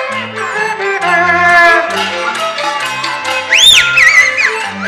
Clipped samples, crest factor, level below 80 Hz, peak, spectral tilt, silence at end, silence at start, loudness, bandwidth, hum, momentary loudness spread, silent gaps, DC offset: 0.2%; 10 dB; -46 dBFS; 0 dBFS; -0.5 dB/octave; 0 s; 0 s; -9 LUFS; over 20 kHz; none; 12 LU; none; under 0.1%